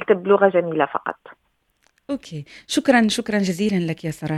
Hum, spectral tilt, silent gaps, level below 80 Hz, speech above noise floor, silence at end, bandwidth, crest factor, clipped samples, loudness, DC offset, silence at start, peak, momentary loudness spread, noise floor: none; -5.5 dB/octave; none; -58 dBFS; 45 dB; 0 s; 14.5 kHz; 20 dB; under 0.1%; -20 LUFS; under 0.1%; 0 s; -2 dBFS; 15 LU; -65 dBFS